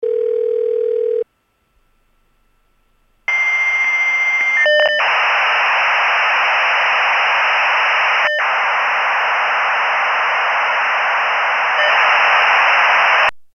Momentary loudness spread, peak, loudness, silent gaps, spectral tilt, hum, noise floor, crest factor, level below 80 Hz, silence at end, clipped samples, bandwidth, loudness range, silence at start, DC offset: 7 LU; 0 dBFS; -13 LUFS; none; 0.5 dB/octave; none; -63 dBFS; 16 dB; -62 dBFS; 0.1 s; under 0.1%; 7 kHz; 6 LU; 0 s; under 0.1%